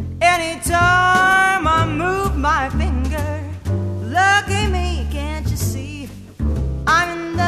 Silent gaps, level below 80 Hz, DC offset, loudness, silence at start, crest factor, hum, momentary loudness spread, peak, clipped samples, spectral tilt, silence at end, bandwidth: none; -26 dBFS; under 0.1%; -18 LUFS; 0 s; 16 dB; none; 11 LU; -2 dBFS; under 0.1%; -4.5 dB/octave; 0 s; 14 kHz